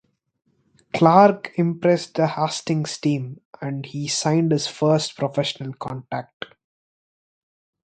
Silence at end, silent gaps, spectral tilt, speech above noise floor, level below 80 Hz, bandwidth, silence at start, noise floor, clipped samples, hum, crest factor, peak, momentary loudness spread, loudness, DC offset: 1.4 s; 3.45-3.53 s, 6.33-6.40 s; -5.5 dB/octave; over 69 dB; -64 dBFS; 9.4 kHz; 0.95 s; under -90 dBFS; under 0.1%; none; 22 dB; 0 dBFS; 16 LU; -21 LUFS; under 0.1%